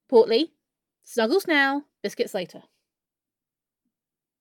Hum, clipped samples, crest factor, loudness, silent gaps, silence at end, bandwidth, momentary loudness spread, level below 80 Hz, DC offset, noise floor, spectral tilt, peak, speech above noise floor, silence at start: none; under 0.1%; 20 dB; -23 LUFS; none; 1.85 s; 17 kHz; 14 LU; -76 dBFS; under 0.1%; -90 dBFS; -3.5 dB/octave; -6 dBFS; 67 dB; 0.1 s